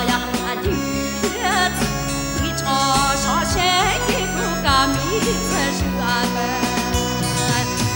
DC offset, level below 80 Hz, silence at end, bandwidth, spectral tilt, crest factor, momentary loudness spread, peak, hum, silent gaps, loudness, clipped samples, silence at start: under 0.1%; -32 dBFS; 0 s; 17 kHz; -3.5 dB/octave; 16 dB; 5 LU; -4 dBFS; none; none; -19 LUFS; under 0.1%; 0 s